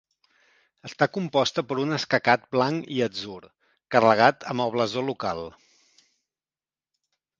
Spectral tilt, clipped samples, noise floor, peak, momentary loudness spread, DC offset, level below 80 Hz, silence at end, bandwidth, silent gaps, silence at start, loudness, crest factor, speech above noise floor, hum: -5 dB/octave; under 0.1%; under -90 dBFS; -2 dBFS; 16 LU; under 0.1%; -64 dBFS; 1.9 s; 7.6 kHz; none; 0.85 s; -24 LUFS; 24 dB; over 66 dB; none